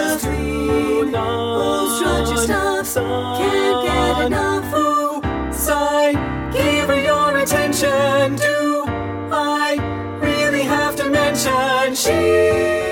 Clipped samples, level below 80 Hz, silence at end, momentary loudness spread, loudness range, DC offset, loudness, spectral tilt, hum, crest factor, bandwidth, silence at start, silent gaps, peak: under 0.1%; -34 dBFS; 0 s; 6 LU; 2 LU; under 0.1%; -18 LUFS; -4 dB/octave; none; 14 dB; 18 kHz; 0 s; none; -4 dBFS